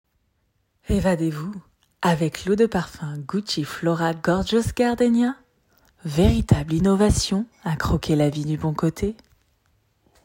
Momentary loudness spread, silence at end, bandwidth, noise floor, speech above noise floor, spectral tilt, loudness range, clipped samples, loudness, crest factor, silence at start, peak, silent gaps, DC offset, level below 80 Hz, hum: 12 LU; 1.1 s; 16.5 kHz; -69 dBFS; 48 dB; -6 dB/octave; 3 LU; under 0.1%; -22 LUFS; 18 dB; 0.9 s; -4 dBFS; none; under 0.1%; -38 dBFS; none